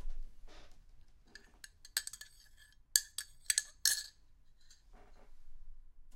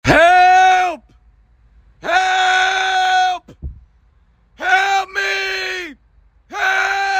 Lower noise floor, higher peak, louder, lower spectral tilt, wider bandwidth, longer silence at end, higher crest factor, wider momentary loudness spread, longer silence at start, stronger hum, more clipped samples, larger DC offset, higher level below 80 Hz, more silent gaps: first, -61 dBFS vs -54 dBFS; second, -6 dBFS vs 0 dBFS; second, -35 LUFS vs -14 LUFS; second, 2.5 dB/octave vs -3 dB/octave; about the same, 16.5 kHz vs 16 kHz; about the same, 0 s vs 0 s; first, 36 dB vs 16 dB; first, 24 LU vs 21 LU; about the same, 0 s vs 0.05 s; neither; neither; neither; second, -52 dBFS vs -42 dBFS; neither